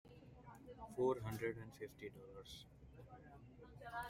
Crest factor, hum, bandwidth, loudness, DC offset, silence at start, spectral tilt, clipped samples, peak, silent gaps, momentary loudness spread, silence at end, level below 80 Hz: 22 dB; none; 16 kHz; -47 LUFS; under 0.1%; 0.05 s; -6 dB/octave; under 0.1%; -26 dBFS; none; 21 LU; 0 s; -68 dBFS